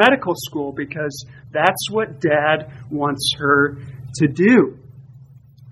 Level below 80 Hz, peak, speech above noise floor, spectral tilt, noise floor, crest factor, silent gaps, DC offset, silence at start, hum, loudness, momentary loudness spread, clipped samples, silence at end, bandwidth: -54 dBFS; 0 dBFS; 26 dB; -5 dB/octave; -45 dBFS; 20 dB; none; under 0.1%; 0 s; none; -19 LUFS; 13 LU; under 0.1%; 0 s; 13 kHz